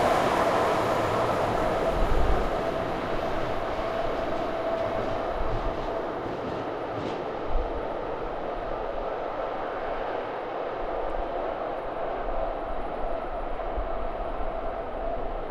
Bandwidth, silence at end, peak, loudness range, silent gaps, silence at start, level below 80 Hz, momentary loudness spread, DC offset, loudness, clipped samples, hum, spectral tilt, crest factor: 14 kHz; 0 s; -10 dBFS; 5 LU; none; 0 s; -36 dBFS; 8 LU; under 0.1%; -30 LUFS; under 0.1%; none; -6 dB/octave; 18 dB